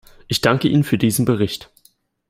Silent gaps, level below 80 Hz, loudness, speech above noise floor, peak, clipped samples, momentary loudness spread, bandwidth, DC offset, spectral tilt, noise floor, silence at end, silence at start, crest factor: none; -50 dBFS; -18 LUFS; 40 dB; 0 dBFS; under 0.1%; 7 LU; 16 kHz; under 0.1%; -5.5 dB/octave; -58 dBFS; 0.65 s; 0.3 s; 18 dB